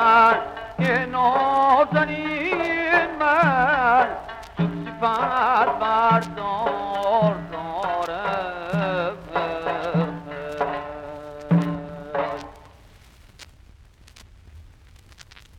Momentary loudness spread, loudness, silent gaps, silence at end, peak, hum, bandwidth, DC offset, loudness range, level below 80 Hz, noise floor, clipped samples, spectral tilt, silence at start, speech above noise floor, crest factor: 13 LU; -22 LUFS; none; 0.35 s; -4 dBFS; none; 10.5 kHz; under 0.1%; 10 LU; -50 dBFS; -50 dBFS; under 0.1%; -7 dB/octave; 0 s; 28 dB; 18 dB